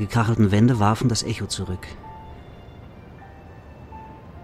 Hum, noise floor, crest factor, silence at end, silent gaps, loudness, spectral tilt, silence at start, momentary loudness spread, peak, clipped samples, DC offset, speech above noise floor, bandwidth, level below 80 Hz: none; -43 dBFS; 18 dB; 0 s; none; -21 LUFS; -6 dB/octave; 0 s; 26 LU; -6 dBFS; under 0.1%; under 0.1%; 22 dB; 13.5 kHz; -44 dBFS